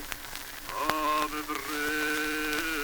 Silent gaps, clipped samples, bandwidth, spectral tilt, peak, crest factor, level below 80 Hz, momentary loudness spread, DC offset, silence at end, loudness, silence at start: none; under 0.1%; over 20 kHz; -2 dB/octave; -6 dBFS; 26 dB; -50 dBFS; 9 LU; under 0.1%; 0 s; -30 LUFS; 0 s